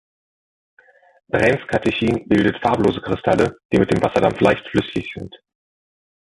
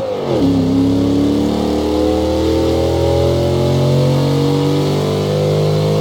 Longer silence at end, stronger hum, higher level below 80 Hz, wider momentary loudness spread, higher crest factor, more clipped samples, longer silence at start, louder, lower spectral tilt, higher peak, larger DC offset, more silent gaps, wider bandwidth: first, 1.05 s vs 0 s; neither; second, -44 dBFS vs -32 dBFS; first, 9 LU vs 2 LU; first, 20 dB vs 10 dB; neither; first, 1.35 s vs 0 s; second, -19 LUFS vs -15 LUFS; about the same, -6.5 dB/octave vs -7 dB/octave; first, 0 dBFS vs -4 dBFS; neither; first, 3.65-3.69 s vs none; second, 11.5 kHz vs 17.5 kHz